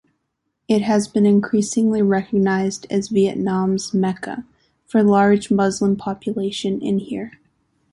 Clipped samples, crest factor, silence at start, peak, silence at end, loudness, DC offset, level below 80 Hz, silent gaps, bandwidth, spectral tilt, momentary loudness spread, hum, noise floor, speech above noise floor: under 0.1%; 16 dB; 0.7 s; -4 dBFS; 0.65 s; -19 LUFS; under 0.1%; -56 dBFS; none; 11.5 kHz; -6 dB/octave; 9 LU; none; -74 dBFS; 56 dB